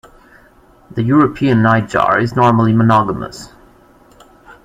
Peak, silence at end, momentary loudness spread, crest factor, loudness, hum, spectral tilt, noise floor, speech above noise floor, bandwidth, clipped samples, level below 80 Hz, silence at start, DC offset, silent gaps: 0 dBFS; 0.1 s; 14 LU; 14 dB; -13 LUFS; none; -7.5 dB/octave; -47 dBFS; 34 dB; 10 kHz; under 0.1%; -44 dBFS; 0.9 s; under 0.1%; none